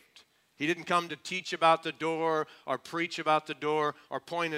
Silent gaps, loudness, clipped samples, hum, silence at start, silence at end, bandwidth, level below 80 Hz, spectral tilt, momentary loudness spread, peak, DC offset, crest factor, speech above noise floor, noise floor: none; -30 LUFS; under 0.1%; none; 0.6 s; 0 s; 15.5 kHz; -82 dBFS; -4 dB/octave; 10 LU; -10 dBFS; under 0.1%; 22 dB; 31 dB; -62 dBFS